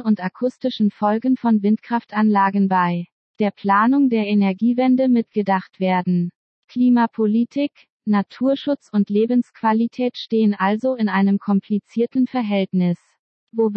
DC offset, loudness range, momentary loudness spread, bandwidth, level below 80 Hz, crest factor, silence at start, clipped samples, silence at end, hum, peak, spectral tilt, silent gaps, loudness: under 0.1%; 2 LU; 7 LU; 6 kHz; -74 dBFS; 14 dB; 0 s; under 0.1%; 0 s; none; -6 dBFS; -9 dB/octave; 3.12-3.34 s, 6.35-6.63 s, 7.90-8.00 s, 13.19-13.47 s; -19 LUFS